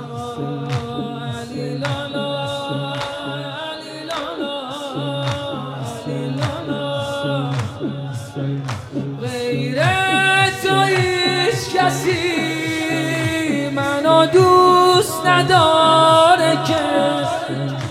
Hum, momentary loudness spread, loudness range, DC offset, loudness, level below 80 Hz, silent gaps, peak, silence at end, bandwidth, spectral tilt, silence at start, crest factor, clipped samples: none; 15 LU; 12 LU; under 0.1%; -18 LUFS; -56 dBFS; none; -2 dBFS; 0 s; 16 kHz; -5 dB/octave; 0 s; 16 dB; under 0.1%